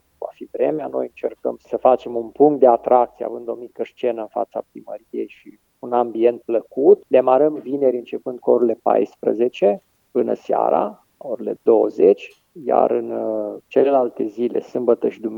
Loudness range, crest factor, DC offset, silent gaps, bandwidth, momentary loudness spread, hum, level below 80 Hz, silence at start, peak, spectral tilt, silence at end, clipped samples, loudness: 4 LU; 18 dB; under 0.1%; none; 6.8 kHz; 15 LU; none; -70 dBFS; 0.2 s; 0 dBFS; -8 dB/octave; 0 s; under 0.1%; -19 LUFS